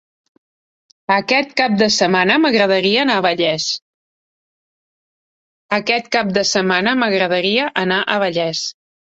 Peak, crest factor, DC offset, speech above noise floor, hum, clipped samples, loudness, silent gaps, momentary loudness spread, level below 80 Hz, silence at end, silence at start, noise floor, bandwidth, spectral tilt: -2 dBFS; 16 dB; under 0.1%; over 74 dB; none; under 0.1%; -16 LUFS; 3.82-5.69 s; 7 LU; -60 dBFS; 0.4 s; 1.1 s; under -90 dBFS; 8 kHz; -3.5 dB/octave